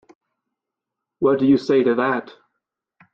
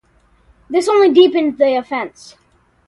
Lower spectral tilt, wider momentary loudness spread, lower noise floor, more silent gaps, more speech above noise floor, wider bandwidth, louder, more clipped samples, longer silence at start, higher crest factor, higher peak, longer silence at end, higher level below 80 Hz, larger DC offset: first, -7.5 dB/octave vs -4 dB/octave; second, 6 LU vs 14 LU; first, -84 dBFS vs -54 dBFS; neither; first, 66 dB vs 40 dB; second, 7 kHz vs 11.5 kHz; second, -19 LUFS vs -14 LUFS; neither; first, 1.2 s vs 0.7 s; about the same, 16 dB vs 16 dB; second, -6 dBFS vs 0 dBFS; about the same, 0.9 s vs 0.8 s; about the same, -62 dBFS vs -58 dBFS; neither